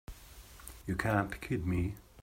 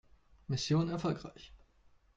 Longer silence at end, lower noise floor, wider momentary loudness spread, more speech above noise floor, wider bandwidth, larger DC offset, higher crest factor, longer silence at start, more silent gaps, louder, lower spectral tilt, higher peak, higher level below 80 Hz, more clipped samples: second, 0 s vs 0.6 s; second, -53 dBFS vs -66 dBFS; second, 20 LU vs 23 LU; second, 20 dB vs 32 dB; first, 16 kHz vs 8.6 kHz; neither; about the same, 20 dB vs 16 dB; second, 0.1 s vs 0.5 s; neither; about the same, -35 LUFS vs -35 LUFS; about the same, -6.5 dB/octave vs -6 dB/octave; first, -16 dBFS vs -20 dBFS; first, -50 dBFS vs -60 dBFS; neither